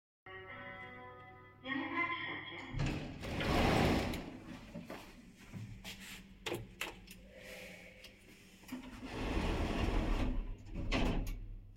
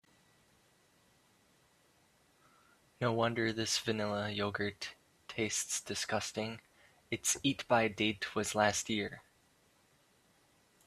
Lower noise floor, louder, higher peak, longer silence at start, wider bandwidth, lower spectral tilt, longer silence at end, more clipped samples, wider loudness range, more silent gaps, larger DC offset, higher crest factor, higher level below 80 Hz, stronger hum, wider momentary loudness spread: second, -59 dBFS vs -70 dBFS; second, -39 LUFS vs -35 LUFS; second, -18 dBFS vs -12 dBFS; second, 0.25 s vs 3 s; about the same, 16 kHz vs 15.5 kHz; first, -5.5 dB/octave vs -3 dB/octave; second, 0 s vs 1.65 s; neither; first, 11 LU vs 4 LU; neither; neither; about the same, 20 dB vs 24 dB; first, -44 dBFS vs -70 dBFS; neither; first, 19 LU vs 12 LU